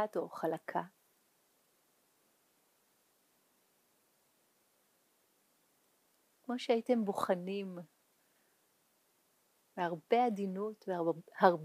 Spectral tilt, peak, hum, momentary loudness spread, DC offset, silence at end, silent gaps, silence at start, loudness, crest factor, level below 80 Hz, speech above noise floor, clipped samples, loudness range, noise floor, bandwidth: -6.5 dB/octave; -10 dBFS; none; 14 LU; under 0.1%; 0 s; none; 0 s; -36 LUFS; 28 dB; under -90 dBFS; 40 dB; under 0.1%; 8 LU; -75 dBFS; 15.5 kHz